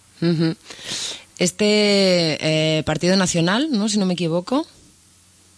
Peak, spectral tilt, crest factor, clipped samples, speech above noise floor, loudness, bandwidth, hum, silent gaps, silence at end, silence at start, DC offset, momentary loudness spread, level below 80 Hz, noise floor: -6 dBFS; -4.5 dB/octave; 14 dB; under 0.1%; 34 dB; -19 LUFS; 11 kHz; none; none; 0.95 s; 0.2 s; under 0.1%; 10 LU; -52 dBFS; -53 dBFS